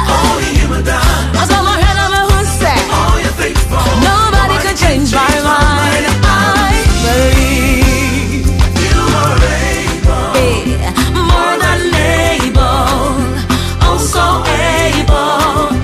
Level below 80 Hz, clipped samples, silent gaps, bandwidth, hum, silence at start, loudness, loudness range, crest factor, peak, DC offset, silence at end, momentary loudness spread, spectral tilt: -16 dBFS; under 0.1%; none; 15.5 kHz; none; 0 s; -11 LUFS; 2 LU; 10 dB; 0 dBFS; under 0.1%; 0 s; 4 LU; -4.5 dB/octave